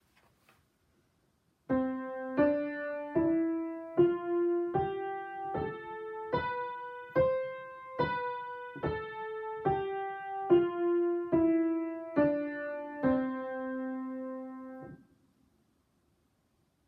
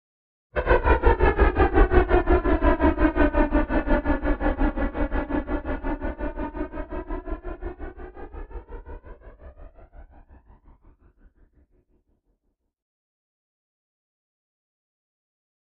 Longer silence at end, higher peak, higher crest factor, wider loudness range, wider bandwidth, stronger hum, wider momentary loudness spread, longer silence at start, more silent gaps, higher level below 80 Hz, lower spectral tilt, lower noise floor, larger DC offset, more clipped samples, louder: second, 1.9 s vs 5.7 s; second, -14 dBFS vs -4 dBFS; about the same, 20 dB vs 22 dB; second, 6 LU vs 22 LU; about the same, 4.9 kHz vs 4.7 kHz; neither; second, 12 LU vs 21 LU; first, 1.7 s vs 0.55 s; neither; second, -64 dBFS vs -28 dBFS; second, -9.5 dB/octave vs -11.5 dB/octave; about the same, -74 dBFS vs -74 dBFS; neither; neither; second, -33 LUFS vs -24 LUFS